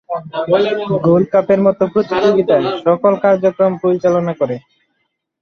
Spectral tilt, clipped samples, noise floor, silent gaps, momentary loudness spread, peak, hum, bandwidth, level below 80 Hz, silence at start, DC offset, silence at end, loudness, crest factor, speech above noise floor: -8 dB/octave; under 0.1%; -69 dBFS; none; 7 LU; 0 dBFS; none; 6.6 kHz; -56 dBFS; 0.1 s; under 0.1%; 0.85 s; -14 LUFS; 14 dB; 55 dB